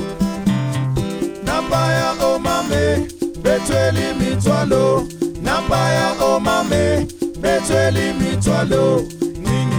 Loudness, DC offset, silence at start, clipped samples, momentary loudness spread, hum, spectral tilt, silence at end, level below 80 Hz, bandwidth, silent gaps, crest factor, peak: -18 LUFS; under 0.1%; 0 s; under 0.1%; 6 LU; none; -5.5 dB/octave; 0 s; -36 dBFS; over 20 kHz; none; 14 dB; -2 dBFS